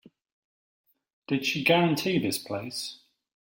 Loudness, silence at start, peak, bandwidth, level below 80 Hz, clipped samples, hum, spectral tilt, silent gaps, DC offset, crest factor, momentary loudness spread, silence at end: -27 LUFS; 1.3 s; -8 dBFS; 16.5 kHz; -70 dBFS; under 0.1%; none; -4.5 dB/octave; none; under 0.1%; 22 dB; 12 LU; 0.55 s